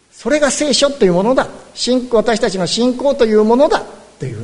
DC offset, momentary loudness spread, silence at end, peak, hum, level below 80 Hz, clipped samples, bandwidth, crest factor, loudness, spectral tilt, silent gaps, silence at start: under 0.1%; 9 LU; 0 s; 0 dBFS; none; -42 dBFS; under 0.1%; 11 kHz; 14 dB; -14 LUFS; -4 dB/octave; none; 0.2 s